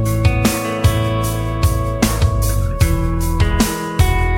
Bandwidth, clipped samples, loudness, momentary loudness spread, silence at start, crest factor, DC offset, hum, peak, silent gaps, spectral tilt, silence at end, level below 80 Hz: 17 kHz; under 0.1%; -17 LUFS; 3 LU; 0 s; 16 dB; under 0.1%; none; 0 dBFS; none; -5.5 dB/octave; 0 s; -20 dBFS